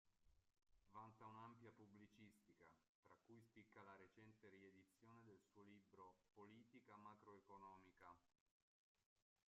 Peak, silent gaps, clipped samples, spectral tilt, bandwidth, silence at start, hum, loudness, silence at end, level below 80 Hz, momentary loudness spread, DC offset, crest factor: -50 dBFS; 2.89-3.03 s, 8.40-8.95 s, 9.06-9.16 s; under 0.1%; -5.5 dB/octave; 7.2 kHz; 0.05 s; none; -67 LUFS; 0.25 s; under -90 dBFS; 6 LU; under 0.1%; 20 dB